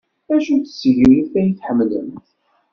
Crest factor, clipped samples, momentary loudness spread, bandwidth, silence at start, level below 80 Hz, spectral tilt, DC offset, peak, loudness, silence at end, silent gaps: 16 dB; under 0.1%; 9 LU; 6.6 kHz; 0.3 s; -46 dBFS; -7 dB/octave; under 0.1%; -2 dBFS; -16 LUFS; 0.55 s; none